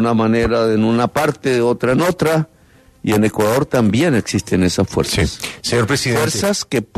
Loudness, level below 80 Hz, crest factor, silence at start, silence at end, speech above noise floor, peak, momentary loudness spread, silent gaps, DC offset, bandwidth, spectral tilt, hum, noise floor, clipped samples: -16 LUFS; -38 dBFS; 14 dB; 0 s; 0.1 s; 33 dB; -2 dBFS; 4 LU; none; under 0.1%; 14 kHz; -5 dB/octave; none; -49 dBFS; under 0.1%